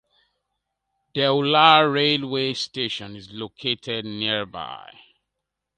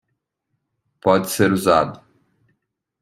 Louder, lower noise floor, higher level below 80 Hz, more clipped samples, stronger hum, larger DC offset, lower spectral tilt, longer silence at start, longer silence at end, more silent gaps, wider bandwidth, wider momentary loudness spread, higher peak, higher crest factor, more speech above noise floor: second, -21 LUFS vs -18 LUFS; first, -82 dBFS vs -76 dBFS; second, -64 dBFS vs -58 dBFS; neither; neither; neither; about the same, -4.5 dB/octave vs -5 dB/octave; about the same, 1.15 s vs 1.05 s; about the same, 1 s vs 1.05 s; neither; second, 9.2 kHz vs 16 kHz; first, 21 LU vs 7 LU; about the same, 0 dBFS vs -2 dBFS; about the same, 24 dB vs 20 dB; about the same, 60 dB vs 59 dB